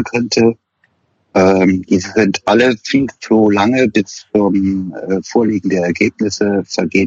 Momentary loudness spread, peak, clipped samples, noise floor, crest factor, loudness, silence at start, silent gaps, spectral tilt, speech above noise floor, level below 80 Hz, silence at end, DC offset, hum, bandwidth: 6 LU; 0 dBFS; under 0.1%; -61 dBFS; 14 dB; -14 LUFS; 0 s; none; -5.5 dB/octave; 47 dB; -50 dBFS; 0 s; under 0.1%; none; 7.8 kHz